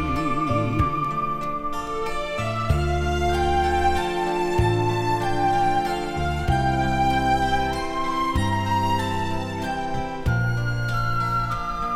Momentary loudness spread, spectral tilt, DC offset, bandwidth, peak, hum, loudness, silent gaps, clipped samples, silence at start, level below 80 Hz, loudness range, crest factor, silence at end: 6 LU; -6 dB/octave; under 0.1%; 15.5 kHz; -8 dBFS; none; -23 LUFS; none; under 0.1%; 0 s; -32 dBFS; 2 LU; 16 dB; 0 s